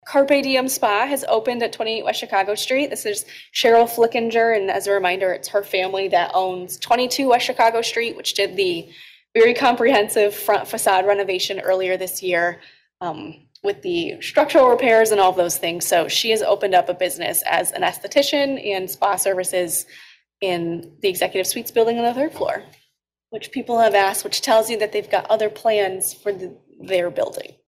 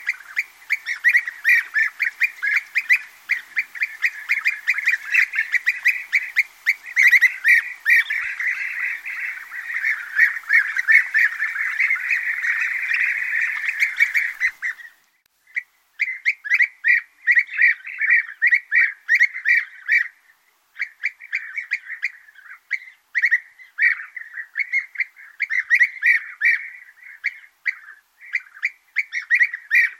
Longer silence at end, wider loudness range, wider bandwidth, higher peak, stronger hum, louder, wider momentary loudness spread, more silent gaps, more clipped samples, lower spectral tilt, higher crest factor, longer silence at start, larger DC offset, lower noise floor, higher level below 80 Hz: first, 0.25 s vs 0.05 s; about the same, 4 LU vs 6 LU; about the same, 16 kHz vs 16.5 kHz; second, -6 dBFS vs -2 dBFS; neither; about the same, -19 LUFS vs -19 LUFS; second, 10 LU vs 13 LU; neither; neither; first, -2 dB/octave vs 4 dB/octave; second, 14 dB vs 20 dB; about the same, 0.05 s vs 0 s; neither; first, -69 dBFS vs -63 dBFS; first, -64 dBFS vs -80 dBFS